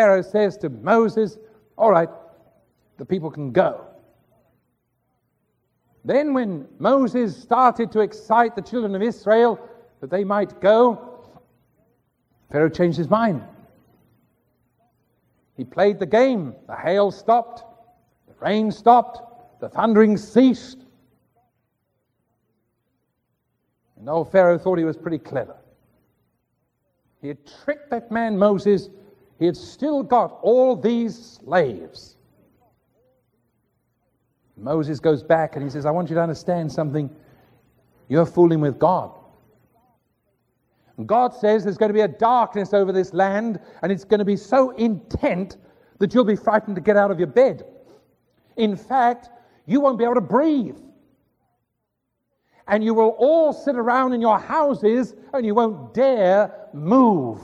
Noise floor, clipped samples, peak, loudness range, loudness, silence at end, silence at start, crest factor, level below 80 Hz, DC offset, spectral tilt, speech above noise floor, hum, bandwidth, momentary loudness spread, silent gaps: -77 dBFS; under 0.1%; -2 dBFS; 7 LU; -20 LUFS; 0 s; 0 s; 20 dB; -58 dBFS; under 0.1%; -7.5 dB/octave; 57 dB; none; 9.6 kHz; 12 LU; none